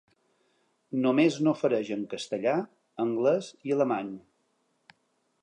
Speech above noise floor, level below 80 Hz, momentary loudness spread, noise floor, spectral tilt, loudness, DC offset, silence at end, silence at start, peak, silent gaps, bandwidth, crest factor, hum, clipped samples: 47 dB; -80 dBFS; 11 LU; -74 dBFS; -6 dB/octave; -28 LUFS; under 0.1%; 1.25 s; 0.9 s; -10 dBFS; none; 10.5 kHz; 18 dB; none; under 0.1%